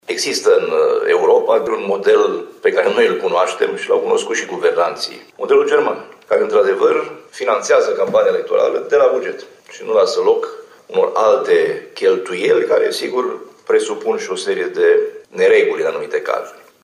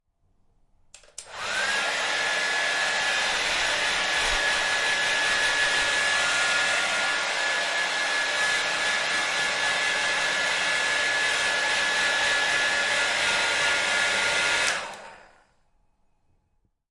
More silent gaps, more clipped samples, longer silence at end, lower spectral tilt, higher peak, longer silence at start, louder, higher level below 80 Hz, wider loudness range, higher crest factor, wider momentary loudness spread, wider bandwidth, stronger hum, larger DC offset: neither; neither; second, 0.3 s vs 1.75 s; first, -3 dB/octave vs 0.5 dB/octave; first, -4 dBFS vs -8 dBFS; second, 0.1 s vs 1.2 s; first, -16 LUFS vs -23 LUFS; second, -68 dBFS vs -54 dBFS; about the same, 2 LU vs 3 LU; about the same, 12 dB vs 16 dB; first, 9 LU vs 3 LU; about the same, 12.5 kHz vs 11.5 kHz; neither; neither